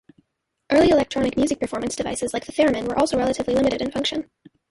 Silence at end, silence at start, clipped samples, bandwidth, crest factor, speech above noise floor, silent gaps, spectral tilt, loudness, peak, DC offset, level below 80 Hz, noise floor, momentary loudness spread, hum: 0.45 s; 0.7 s; under 0.1%; 11.5 kHz; 16 dB; 54 dB; none; -4.5 dB/octave; -22 LUFS; -6 dBFS; under 0.1%; -48 dBFS; -75 dBFS; 8 LU; none